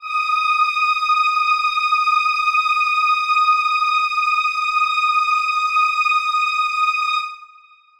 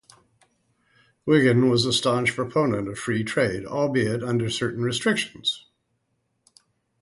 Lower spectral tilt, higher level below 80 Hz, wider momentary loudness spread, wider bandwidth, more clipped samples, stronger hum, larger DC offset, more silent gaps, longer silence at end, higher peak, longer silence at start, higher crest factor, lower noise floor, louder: second, 5.5 dB/octave vs -5 dB/octave; second, -66 dBFS vs -58 dBFS; second, 2 LU vs 8 LU; first, 14.5 kHz vs 11.5 kHz; neither; neither; neither; neither; second, 0.55 s vs 1.4 s; about the same, -6 dBFS vs -6 dBFS; second, 0 s vs 1.25 s; second, 12 dB vs 20 dB; second, -49 dBFS vs -74 dBFS; first, -17 LUFS vs -23 LUFS